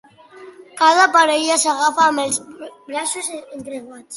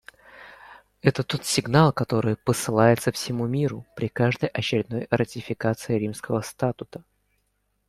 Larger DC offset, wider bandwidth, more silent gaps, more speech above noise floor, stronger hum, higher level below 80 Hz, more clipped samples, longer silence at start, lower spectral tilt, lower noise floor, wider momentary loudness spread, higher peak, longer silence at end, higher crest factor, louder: neither; second, 12 kHz vs 15 kHz; neither; second, 25 dB vs 48 dB; second, none vs 50 Hz at -55 dBFS; second, -70 dBFS vs -56 dBFS; neither; about the same, 0.35 s vs 0.35 s; second, -0.5 dB/octave vs -5.5 dB/octave; second, -42 dBFS vs -72 dBFS; first, 20 LU vs 11 LU; about the same, -2 dBFS vs -4 dBFS; second, 0 s vs 0.9 s; about the same, 18 dB vs 22 dB; first, -16 LUFS vs -24 LUFS